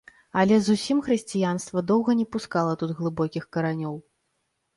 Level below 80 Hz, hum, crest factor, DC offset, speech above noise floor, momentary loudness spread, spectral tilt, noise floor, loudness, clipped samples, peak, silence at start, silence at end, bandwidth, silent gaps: -60 dBFS; none; 16 dB; under 0.1%; 51 dB; 8 LU; -6 dB/octave; -75 dBFS; -25 LUFS; under 0.1%; -8 dBFS; 0.35 s; 0.75 s; 11.5 kHz; none